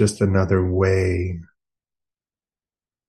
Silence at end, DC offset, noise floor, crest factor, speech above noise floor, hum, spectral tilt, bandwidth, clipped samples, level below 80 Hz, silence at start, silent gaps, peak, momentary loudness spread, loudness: 1.65 s; under 0.1%; under -90 dBFS; 18 dB; over 71 dB; none; -7 dB/octave; 11.5 kHz; under 0.1%; -52 dBFS; 0 s; none; -4 dBFS; 10 LU; -20 LUFS